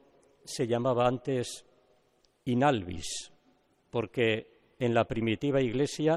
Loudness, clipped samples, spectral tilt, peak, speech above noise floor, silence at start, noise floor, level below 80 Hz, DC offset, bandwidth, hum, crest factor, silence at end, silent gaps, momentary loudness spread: -30 LUFS; under 0.1%; -5.5 dB/octave; -12 dBFS; 40 dB; 0.45 s; -69 dBFS; -58 dBFS; under 0.1%; 13 kHz; none; 18 dB; 0 s; none; 12 LU